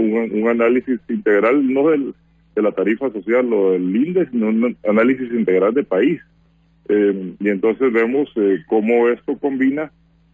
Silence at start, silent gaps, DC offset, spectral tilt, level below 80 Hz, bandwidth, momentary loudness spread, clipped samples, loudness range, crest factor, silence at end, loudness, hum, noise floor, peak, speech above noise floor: 0 s; none; under 0.1%; -9 dB/octave; -60 dBFS; 7.4 kHz; 6 LU; under 0.1%; 1 LU; 12 dB; 0.45 s; -18 LUFS; none; -55 dBFS; -4 dBFS; 38 dB